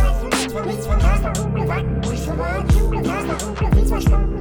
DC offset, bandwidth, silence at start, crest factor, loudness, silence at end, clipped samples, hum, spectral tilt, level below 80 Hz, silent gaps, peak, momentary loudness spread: under 0.1%; 19 kHz; 0 s; 14 dB; -20 LUFS; 0 s; under 0.1%; none; -6 dB/octave; -20 dBFS; none; -4 dBFS; 5 LU